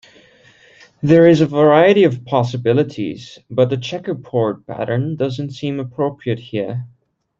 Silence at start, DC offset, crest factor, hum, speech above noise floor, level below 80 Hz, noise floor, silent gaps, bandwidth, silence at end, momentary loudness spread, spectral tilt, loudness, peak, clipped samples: 1.05 s; under 0.1%; 16 dB; none; 33 dB; -56 dBFS; -49 dBFS; none; 7.6 kHz; 0.5 s; 15 LU; -7.5 dB/octave; -17 LUFS; -2 dBFS; under 0.1%